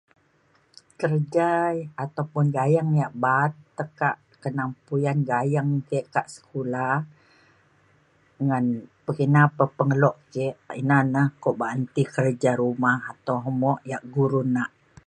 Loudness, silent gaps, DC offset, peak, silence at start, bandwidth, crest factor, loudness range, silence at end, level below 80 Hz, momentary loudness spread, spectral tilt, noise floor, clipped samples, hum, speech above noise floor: -24 LUFS; none; under 0.1%; -4 dBFS; 1 s; 10 kHz; 20 dB; 5 LU; 0.4 s; -68 dBFS; 9 LU; -8 dB/octave; -63 dBFS; under 0.1%; none; 40 dB